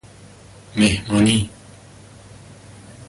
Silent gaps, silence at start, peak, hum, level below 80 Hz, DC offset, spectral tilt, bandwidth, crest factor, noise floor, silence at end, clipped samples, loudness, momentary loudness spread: none; 0.75 s; -4 dBFS; none; -42 dBFS; under 0.1%; -4.5 dB/octave; 11.5 kHz; 20 dB; -44 dBFS; 0.05 s; under 0.1%; -19 LUFS; 15 LU